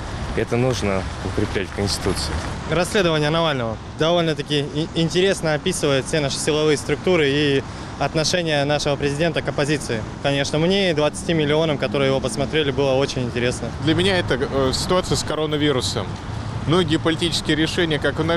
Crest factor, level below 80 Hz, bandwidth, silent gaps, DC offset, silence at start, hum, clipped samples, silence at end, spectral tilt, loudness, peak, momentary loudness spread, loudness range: 12 dB; -38 dBFS; 13.5 kHz; none; under 0.1%; 0 s; none; under 0.1%; 0 s; -4.5 dB/octave; -20 LUFS; -8 dBFS; 6 LU; 1 LU